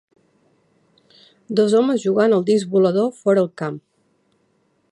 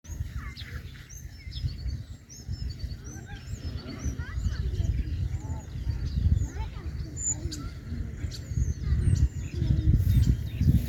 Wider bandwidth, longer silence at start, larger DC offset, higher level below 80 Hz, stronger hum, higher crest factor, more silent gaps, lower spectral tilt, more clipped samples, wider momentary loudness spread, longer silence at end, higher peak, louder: second, 11 kHz vs 17 kHz; first, 1.5 s vs 0.05 s; neither; second, -72 dBFS vs -32 dBFS; neither; about the same, 16 dB vs 20 dB; neither; about the same, -6.5 dB/octave vs -5.5 dB/octave; neither; second, 10 LU vs 16 LU; first, 1.1 s vs 0 s; first, -4 dBFS vs -8 dBFS; first, -18 LUFS vs -31 LUFS